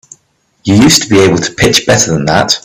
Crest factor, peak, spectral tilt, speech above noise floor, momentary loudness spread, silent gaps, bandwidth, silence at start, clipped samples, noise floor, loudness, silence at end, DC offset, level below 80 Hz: 10 dB; 0 dBFS; -3.5 dB/octave; 48 dB; 5 LU; none; over 20 kHz; 0.65 s; 0.3%; -56 dBFS; -8 LUFS; 0.05 s; under 0.1%; -36 dBFS